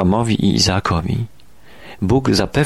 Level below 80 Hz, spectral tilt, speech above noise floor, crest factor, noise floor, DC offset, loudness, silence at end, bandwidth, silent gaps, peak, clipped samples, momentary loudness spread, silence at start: -36 dBFS; -5 dB/octave; 30 dB; 14 dB; -46 dBFS; 0.7%; -17 LUFS; 0 s; 13 kHz; none; -2 dBFS; under 0.1%; 10 LU; 0 s